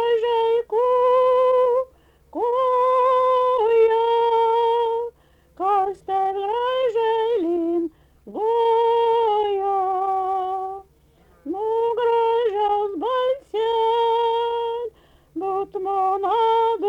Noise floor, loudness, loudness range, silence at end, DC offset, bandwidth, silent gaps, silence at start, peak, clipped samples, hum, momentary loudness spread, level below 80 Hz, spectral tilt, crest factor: -56 dBFS; -21 LUFS; 4 LU; 0 s; under 0.1%; 5.6 kHz; none; 0 s; -10 dBFS; under 0.1%; none; 10 LU; -60 dBFS; -5 dB/octave; 12 dB